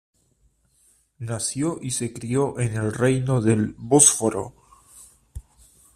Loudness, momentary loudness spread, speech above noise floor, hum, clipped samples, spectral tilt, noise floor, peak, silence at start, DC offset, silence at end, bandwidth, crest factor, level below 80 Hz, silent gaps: -21 LUFS; 18 LU; 42 dB; none; under 0.1%; -4.5 dB/octave; -64 dBFS; 0 dBFS; 1.2 s; under 0.1%; 0.55 s; 14.5 kHz; 24 dB; -52 dBFS; none